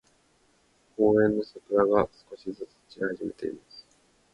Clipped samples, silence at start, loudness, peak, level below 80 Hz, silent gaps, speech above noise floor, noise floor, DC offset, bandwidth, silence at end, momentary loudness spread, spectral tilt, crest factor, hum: under 0.1%; 1 s; -27 LUFS; -8 dBFS; -60 dBFS; none; 39 dB; -66 dBFS; under 0.1%; 8 kHz; 0.55 s; 20 LU; -8 dB/octave; 22 dB; none